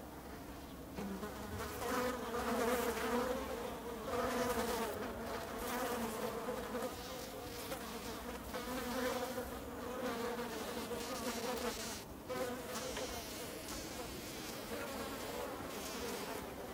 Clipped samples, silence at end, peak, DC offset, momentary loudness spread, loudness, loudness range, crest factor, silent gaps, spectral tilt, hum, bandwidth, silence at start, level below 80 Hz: under 0.1%; 0 s; -24 dBFS; under 0.1%; 8 LU; -42 LUFS; 5 LU; 18 dB; none; -3.5 dB/octave; none; 16 kHz; 0 s; -58 dBFS